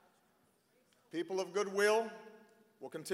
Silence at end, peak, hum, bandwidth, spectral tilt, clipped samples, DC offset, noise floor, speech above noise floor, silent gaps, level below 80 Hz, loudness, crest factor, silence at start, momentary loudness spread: 0 s; -18 dBFS; none; 16 kHz; -3.5 dB/octave; under 0.1%; under 0.1%; -73 dBFS; 38 dB; none; under -90 dBFS; -36 LUFS; 20 dB; 1.15 s; 19 LU